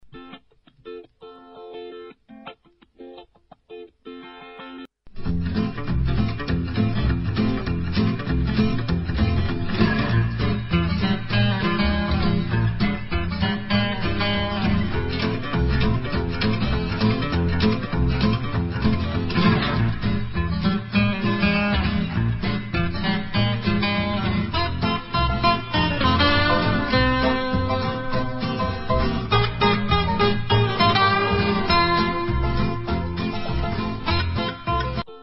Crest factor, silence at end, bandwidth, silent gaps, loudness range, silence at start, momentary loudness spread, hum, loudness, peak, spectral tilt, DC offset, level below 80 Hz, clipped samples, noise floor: 16 dB; 0 s; 5.8 kHz; none; 9 LU; 0.05 s; 10 LU; none; -22 LUFS; -6 dBFS; -10 dB/octave; under 0.1%; -32 dBFS; under 0.1%; -54 dBFS